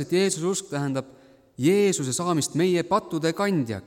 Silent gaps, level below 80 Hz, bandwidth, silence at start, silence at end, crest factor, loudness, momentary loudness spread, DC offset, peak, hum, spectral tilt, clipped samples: none; -64 dBFS; 16.5 kHz; 0 s; 0.05 s; 16 dB; -24 LUFS; 7 LU; under 0.1%; -10 dBFS; none; -5 dB/octave; under 0.1%